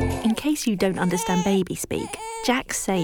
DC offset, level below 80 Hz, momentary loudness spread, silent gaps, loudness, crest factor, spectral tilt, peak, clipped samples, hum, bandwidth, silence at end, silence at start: under 0.1%; -44 dBFS; 6 LU; none; -24 LUFS; 16 dB; -4.5 dB/octave; -8 dBFS; under 0.1%; none; 19.5 kHz; 0 s; 0 s